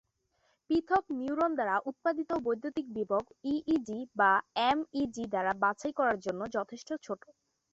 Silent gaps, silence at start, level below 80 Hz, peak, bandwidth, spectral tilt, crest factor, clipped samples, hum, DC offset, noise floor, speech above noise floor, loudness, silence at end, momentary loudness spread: none; 0.7 s; -66 dBFS; -14 dBFS; 8 kHz; -5 dB/octave; 18 dB; under 0.1%; none; under 0.1%; -75 dBFS; 43 dB; -32 LUFS; 0.55 s; 9 LU